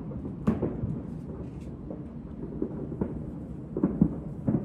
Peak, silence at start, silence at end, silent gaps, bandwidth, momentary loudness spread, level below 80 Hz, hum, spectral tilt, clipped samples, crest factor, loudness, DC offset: -8 dBFS; 0 s; 0 s; none; 7.2 kHz; 12 LU; -46 dBFS; none; -11 dB/octave; under 0.1%; 22 dB; -33 LUFS; under 0.1%